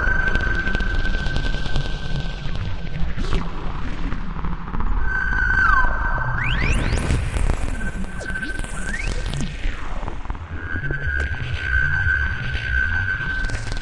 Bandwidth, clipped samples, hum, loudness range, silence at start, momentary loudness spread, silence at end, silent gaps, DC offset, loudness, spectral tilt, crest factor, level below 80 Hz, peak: 11.5 kHz; under 0.1%; none; 7 LU; 0 s; 11 LU; 0 s; none; under 0.1%; -24 LUFS; -5 dB/octave; 18 dB; -24 dBFS; -4 dBFS